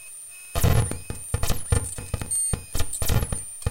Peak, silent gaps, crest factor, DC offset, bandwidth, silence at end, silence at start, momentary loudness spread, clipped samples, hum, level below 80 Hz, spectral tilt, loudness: -8 dBFS; none; 16 dB; under 0.1%; 17 kHz; 0 s; 0 s; 10 LU; under 0.1%; none; -32 dBFS; -4 dB/octave; -26 LUFS